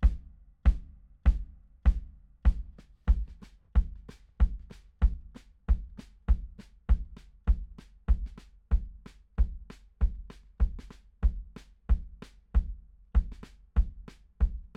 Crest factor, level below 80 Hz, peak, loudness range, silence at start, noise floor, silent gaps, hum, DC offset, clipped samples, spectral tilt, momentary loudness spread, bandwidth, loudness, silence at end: 18 dB; -30 dBFS; -12 dBFS; 3 LU; 0 s; -51 dBFS; none; none; under 0.1%; under 0.1%; -8.5 dB/octave; 20 LU; 3.9 kHz; -33 LUFS; 0.15 s